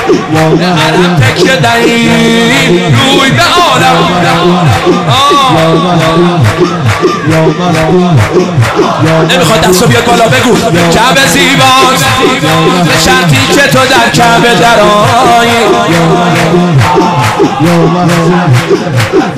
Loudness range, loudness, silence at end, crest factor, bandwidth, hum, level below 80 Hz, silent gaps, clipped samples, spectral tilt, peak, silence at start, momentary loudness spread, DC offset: 2 LU; -5 LUFS; 0 s; 6 dB; 16 kHz; none; -32 dBFS; none; 1%; -4.5 dB/octave; 0 dBFS; 0 s; 4 LU; under 0.1%